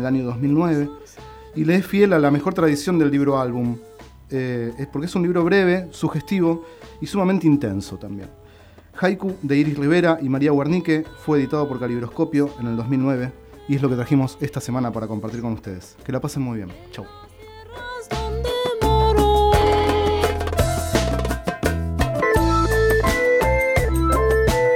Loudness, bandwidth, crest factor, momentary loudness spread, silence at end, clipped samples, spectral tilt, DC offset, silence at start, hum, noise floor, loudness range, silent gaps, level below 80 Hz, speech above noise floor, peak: -20 LUFS; over 20 kHz; 16 dB; 15 LU; 0 s; under 0.1%; -6.5 dB/octave; under 0.1%; 0 s; none; -46 dBFS; 6 LU; none; -32 dBFS; 26 dB; -4 dBFS